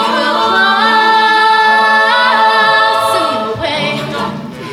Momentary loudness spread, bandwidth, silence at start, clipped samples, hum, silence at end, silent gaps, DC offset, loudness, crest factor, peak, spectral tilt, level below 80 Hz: 9 LU; 16 kHz; 0 s; under 0.1%; none; 0 s; none; under 0.1%; -10 LUFS; 10 dB; 0 dBFS; -3 dB/octave; -50 dBFS